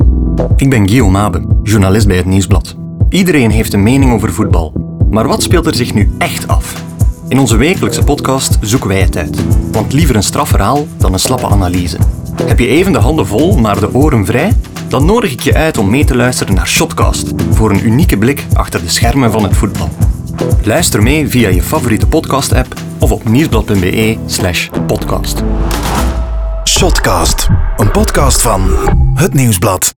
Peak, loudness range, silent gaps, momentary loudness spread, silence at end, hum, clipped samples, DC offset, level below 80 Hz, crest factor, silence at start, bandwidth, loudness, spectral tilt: 0 dBFS; 2 LU; none; 6 LU; 0.1 s; none; under 0.1%; under 0.1%; -16 dBFS; 10 dB; 0 s; over 20 kHz; -11 LUFS; -5 dB/octave